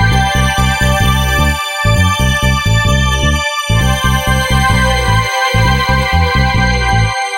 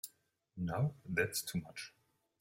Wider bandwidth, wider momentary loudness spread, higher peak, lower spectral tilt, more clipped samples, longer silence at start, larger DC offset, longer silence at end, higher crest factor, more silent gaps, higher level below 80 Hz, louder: about the same, 16 kHz vs 16.5 kHz; second, 2 LU vs 16 LU; first, 0 dBFS vs -20 dBFS; about the same, -4.5 dB/octave vs -4.5 dB/octave; neither; about the same, 0 s vs 0.05 s; neither; second, 0 s vs 0.5 s; second, 12 dB vs 22 dB; neither; first, -18 dBFS vs -68 dBFS; first, -12 LUFS vs -39 LUFS